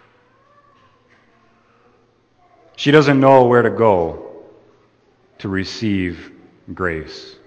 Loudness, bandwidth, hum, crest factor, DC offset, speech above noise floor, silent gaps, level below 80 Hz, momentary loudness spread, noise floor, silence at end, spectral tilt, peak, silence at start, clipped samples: -16 LUFS; 8.6 kHz; none; 18 dB; under 0.1%; 42 dB; none; -50 dBFS; 23 LU; -57 dBFS; 0.15 s; -6.5 dB/octave; 0 dBFS; 2.8 s; under 0.1%